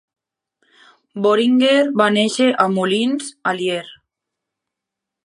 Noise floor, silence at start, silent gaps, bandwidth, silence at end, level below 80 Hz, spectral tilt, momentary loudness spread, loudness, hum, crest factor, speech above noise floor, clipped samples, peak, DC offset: -83 dBFS; 1.15 s; none; 11.5 kHz; 1.3 s; -70 dBFS; -4.5 dB/octave; 9 LU; -17 LUFS; none; 18 dB; 67 dB; under 0.1%; 0 dBFS; under 0.1%